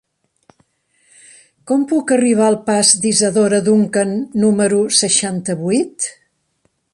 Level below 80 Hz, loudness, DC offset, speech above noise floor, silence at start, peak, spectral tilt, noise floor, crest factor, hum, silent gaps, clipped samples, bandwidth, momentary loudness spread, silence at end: -60 dBFS; -15 LUFS; under 0.1%; 50 dB; 1.65 s; 0 dBFS; -3.5 dB/octave; -65 dBFS; 16 dB; none; none; under 0.1%; 11.5 kHz; 8 LU; 0.8 s